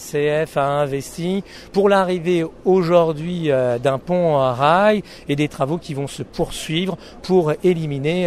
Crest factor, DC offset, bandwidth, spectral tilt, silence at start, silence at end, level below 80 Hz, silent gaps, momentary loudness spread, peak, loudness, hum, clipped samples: 16 dB; under 0.1%; 14.5 kHz; -6.5 dB/octave; 0 s; 0 s; -46 dBFS; none; 9 LU; -2 dBFS; -19 LUFS; none; under 0.1%